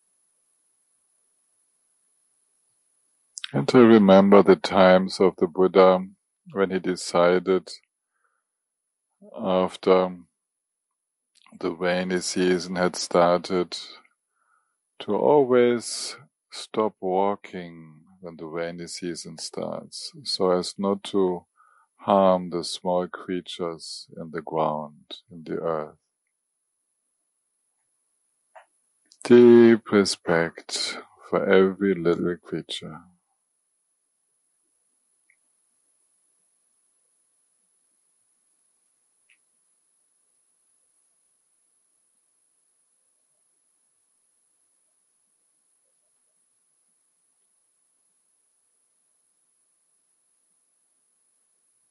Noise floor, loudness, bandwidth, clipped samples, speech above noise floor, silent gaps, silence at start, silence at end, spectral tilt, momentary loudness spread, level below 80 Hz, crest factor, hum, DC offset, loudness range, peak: -83 dBFS; -22 LUFS; 11.5 kHz; under 0.1%; 61 dB; none; 3.55 s; 18.95 s; -5.5 dB/octave; 22 LU; -70 dBFS; 22 dB; none; under 0.1%; 14 LU; -2 dBFS